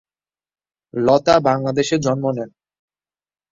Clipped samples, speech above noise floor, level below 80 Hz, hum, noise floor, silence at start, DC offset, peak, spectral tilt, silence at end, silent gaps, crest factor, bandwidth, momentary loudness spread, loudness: under 0.1%; over 73 dB; -54 dBFS; none; under -90 dBFS; 0.95 s; under 0.1%; 0 dBFS; -5.5 dB/octave; 1.05 s; none; 20 dB; 7.8 kHz; 14 LU; -18 LUFS